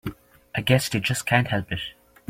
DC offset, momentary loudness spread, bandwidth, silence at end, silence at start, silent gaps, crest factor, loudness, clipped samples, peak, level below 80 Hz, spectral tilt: under 0.1%; 12 LU; 16.5 kHz; 0.4 s; 0.05 s; none; 22 dB; -24 LUFS; under 0.1%; -2 dBFS; -52 dBFS; -4.5 dB/octave